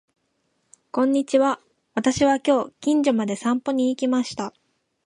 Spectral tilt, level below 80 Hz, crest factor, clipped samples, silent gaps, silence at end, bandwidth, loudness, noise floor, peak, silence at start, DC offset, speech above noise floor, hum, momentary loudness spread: -4.5 dB/octave; -58 dBFS; 16 dB; under 0.1%; none; 0.55 s; 11 kHz; -22 LUFS; -71 dBFS; -6 dBFS; 0.95 s; under 0.1%; 50 dB; none; 11 LU